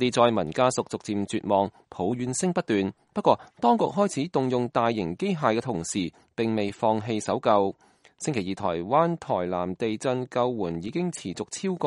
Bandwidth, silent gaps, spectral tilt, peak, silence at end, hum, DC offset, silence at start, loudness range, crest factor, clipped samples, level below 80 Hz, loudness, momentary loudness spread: 11.5 kHz; none; -5.5 dB/octave; -4 dBFS; 0 s; none; under 0.1%; 0 s; 2 LU; 22 dB; under 0.1%; -62 dBFS; -26 LUFS; 8 LU